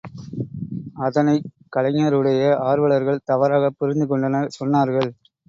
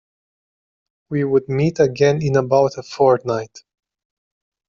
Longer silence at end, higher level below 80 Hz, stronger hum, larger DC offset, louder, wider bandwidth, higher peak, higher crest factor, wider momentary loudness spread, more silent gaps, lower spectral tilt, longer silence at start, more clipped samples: second, 0.35 s vs 1.25 s; about the same, -58 dBFS vs -56 dBFS; neither; neither; about the same, -20 LUFS vs -18 LUFS; about the same, 7.6 kHz vs 7.4 kHz; about the same, -4 dBFS vs -4 dBFS; about the same, 16 dB vs 16 dB; first, 12 LU vs 9 LU; neither; about the same, -8 dB/octave vs -7 dB/octave; second, 0.05 s vs 1.1 s; neither